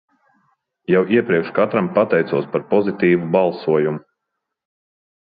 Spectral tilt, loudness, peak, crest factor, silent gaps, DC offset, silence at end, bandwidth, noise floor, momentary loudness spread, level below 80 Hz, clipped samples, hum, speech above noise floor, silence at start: -11.5 dB/octave; -18 LUFS; -2 dBFS; 18 dB; none; under 0.1%; 1.25 s; 5 kHz; -79 dBFS; 5 LU; -62 dBFS; under 0.1%; none; 62 dB; 0.9 s